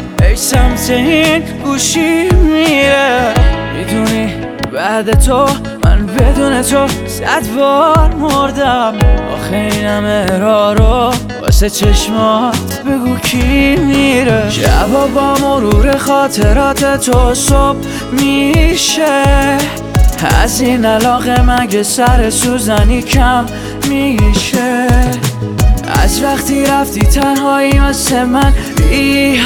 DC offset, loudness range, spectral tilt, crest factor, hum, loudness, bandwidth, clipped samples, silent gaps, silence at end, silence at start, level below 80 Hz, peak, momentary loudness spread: under 0.1%; 2 LU; -4.5 dB/octave; 10 dB; none; -11 LUFS; 19 kHz; under 0.1%; none; 0 s; 0 s; -16 dBFS; 0 dBFS; 5 LU